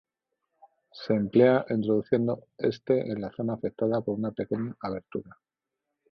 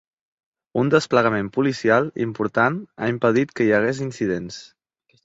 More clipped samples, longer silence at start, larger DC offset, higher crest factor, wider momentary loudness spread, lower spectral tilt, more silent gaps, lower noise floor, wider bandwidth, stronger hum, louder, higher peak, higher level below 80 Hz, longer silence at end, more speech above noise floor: neither; first, 0.95 s vs 0.75 s; neither; about the same, 20 dB vs 20 dB; first, 14 LU vs 8 LU; first, -9.5 dB/octave vs -6.5 dB/octave; neither; first, -86 dBFS vs -65 dBFS; second, 6.2 kHz vs 8 kHz; neither; second, -28 LUFS vs -21 LUFS; second, -8 dBFS vs -2 dBFS; second, -64 dBFS vs -58 dBFS; first, 0.8 s vs 0.6 s; first, 59 dB vs 45 dB